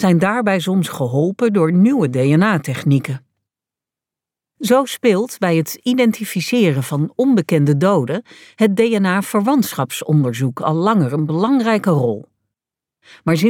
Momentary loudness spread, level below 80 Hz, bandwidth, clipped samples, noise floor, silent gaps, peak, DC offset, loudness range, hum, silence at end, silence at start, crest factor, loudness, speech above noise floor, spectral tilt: 6 LU; -64 dBFS; 18 kHz; under 0.1%; -88 dBFS; none; -2 dBFS; under 0.1%; 3 LU; none; 0 s; 0 s; 14 dB; -16 LUFS; 72 dB; -6.5 dB/octave